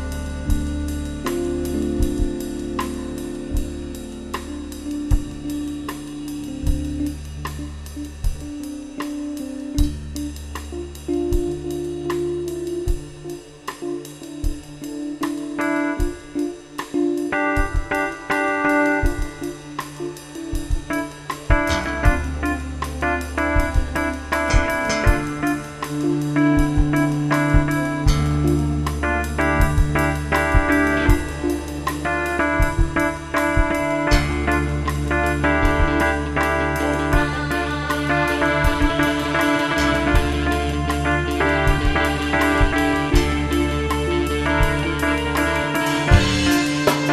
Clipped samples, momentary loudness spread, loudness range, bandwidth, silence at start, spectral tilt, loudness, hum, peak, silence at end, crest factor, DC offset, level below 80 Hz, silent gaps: under 0.1%; 12 LU; 9 LU; 14 kHz; 0 s; -5.5 dB/octave; -21 LUFS; none; 0 dBFS; 0 s; 20 dB; under 0.1%; -26 dBFS; none